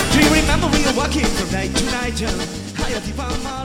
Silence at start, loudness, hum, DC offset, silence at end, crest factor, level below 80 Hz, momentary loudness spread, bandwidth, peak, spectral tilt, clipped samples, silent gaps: 0 s; -19 LUFS; none; under 0.1%; 0 s; 18 dB; -26 dBFS; 11 LU; 16.5 kHz; 0 dBFS; -4 dB/octave; under 0.1%; none